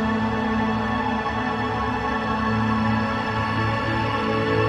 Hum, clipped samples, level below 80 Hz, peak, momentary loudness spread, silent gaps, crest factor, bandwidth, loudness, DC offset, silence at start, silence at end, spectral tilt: none; under 0.1%; -40 dBFS; -10 dBFS; 2 LU; none; 12 dB; 10 kHz; -23 LUFS; under 0.1%; 0 s; 0 s; -7 dB/octave